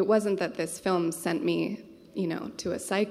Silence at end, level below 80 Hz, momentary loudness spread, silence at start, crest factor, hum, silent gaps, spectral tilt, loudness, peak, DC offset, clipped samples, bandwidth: 0 s; -66 dBFS; 8 LU; 0 s; 16 dB; none; none; -5 dB/octave; -29 LUFS; -12 dBFS; under 0.1%; under 0.1%; 15 kHz